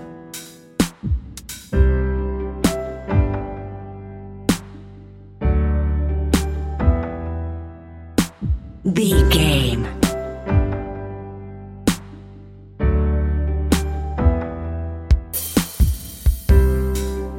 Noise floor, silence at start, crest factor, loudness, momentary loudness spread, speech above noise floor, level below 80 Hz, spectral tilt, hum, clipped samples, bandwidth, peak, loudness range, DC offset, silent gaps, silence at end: -40 dBFS; 0 s; 18 dB; -21 LUFS; 17 LU; 24 dB; -22 dBFS; -5.5 dB/octave; none; under 0.1%; 17 kHz; -2 dBFS; 4 LU; under 0.1%; none; 0 s